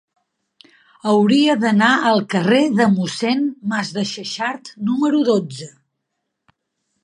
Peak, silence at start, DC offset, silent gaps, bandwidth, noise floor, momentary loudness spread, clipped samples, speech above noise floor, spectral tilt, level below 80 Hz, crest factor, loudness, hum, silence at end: -2 dBFS; 1.05 s; under 0.1%; none; 11 kHz; -76 dBFS; 11 LU; under 0.1%; 59 dB; -5.5 dB/octave; -68 dBFS; 18 dB; -17 LUFS; none; 1.35 s